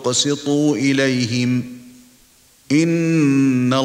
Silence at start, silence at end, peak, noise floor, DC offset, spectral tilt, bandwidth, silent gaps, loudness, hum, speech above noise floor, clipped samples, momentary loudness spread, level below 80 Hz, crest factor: 0 s; 0 s; -4 dBFS; -52 dBFS; under 0.1%; -5 dB/octave; 15 kHz; none; -17 LUFS; none; 36 dB; under 0.1%; 5 LU; -62 dBFS; 14 dB